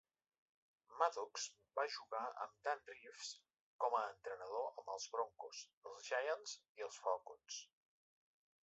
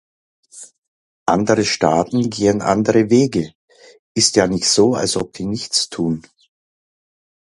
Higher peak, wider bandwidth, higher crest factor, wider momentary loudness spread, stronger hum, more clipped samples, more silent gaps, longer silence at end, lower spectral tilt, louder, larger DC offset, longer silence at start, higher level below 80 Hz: second, -20 dBFS vs 0 dBFS; second, 8 kHz vs 11.5 kHz; first, 26 dB vs 18 dB; first, 13 LU vs 10 LU; neither; neither; second, 3.60-3.79 s, 5.73-5.82 s, 6.69-6.75 s vs 0.78-0.82 s, 0.88-1.26 s, 3.55-3.68 s, 3.99-4.15 s; second, 1 s vs 1.3 s; second, 2.5 dB/octave vs -4 dB/octave; second, -45 LUFS vs -17 LUFS; neither; first, 0.9 s vs 0.55 s; second, under -90 dBFS vs -50 dBFS